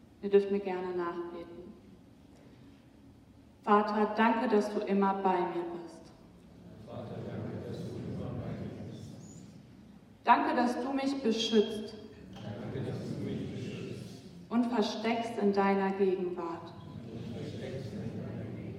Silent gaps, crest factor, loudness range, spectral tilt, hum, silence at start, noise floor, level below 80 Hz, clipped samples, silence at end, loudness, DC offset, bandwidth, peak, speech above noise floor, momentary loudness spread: none; 24 dB; 11 LU; -6 dB/octave; none; 0.2 s; -57 dBFS; -66 dBFS; under 0.1%; 0 s; -32 LUFS; under 0.1%; 12 kHz; -10 dBFS; 27 dB; 19 LU